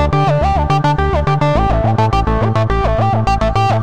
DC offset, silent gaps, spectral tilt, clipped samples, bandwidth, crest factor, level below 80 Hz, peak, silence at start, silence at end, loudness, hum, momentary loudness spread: 3%; none; -7.5 dB/octave; under 0.1%; 9.2 kHz; 12 dB; -22 dBFS; -2 dBFS; 0 s; 0 s; -14 LUFS; none; 1 LU